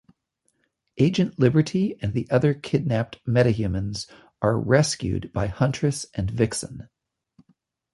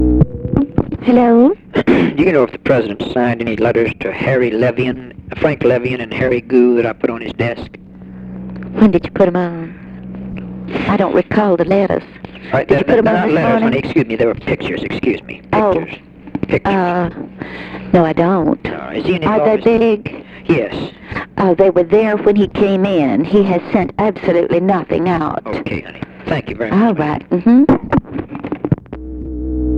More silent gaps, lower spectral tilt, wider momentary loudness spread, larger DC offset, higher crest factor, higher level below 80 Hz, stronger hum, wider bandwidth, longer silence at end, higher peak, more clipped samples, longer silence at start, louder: neither; second, -6 dB/octave vs -9 dB/octave; second, 9 LU vs 16 LU; neither; first, 20 dB vs 14 dB; second, -46 dBFS vs -34 dBFS; neither; first, 11.5 kHz vs 7.4 kHz; first, 1.1 s vs 0 s; second, -4 dBFS vs 0 dBFS; neither; first, 0.95 s vs 0 s; second, -24 LUFS vs -15 LUFS